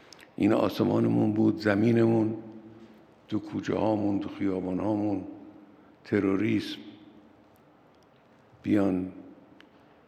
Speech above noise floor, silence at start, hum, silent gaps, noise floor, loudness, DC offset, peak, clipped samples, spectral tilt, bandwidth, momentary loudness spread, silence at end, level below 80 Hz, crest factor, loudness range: 33 dB; 0.2 s; none; none; -59 dBFS; -27 LUFS; under 0.1%; -8 dBFS; under 0.1%; -8 dB/octave; 14 kHz; 18 LU; 0.8 s; -72 dBFS; 20 dB; 7 LU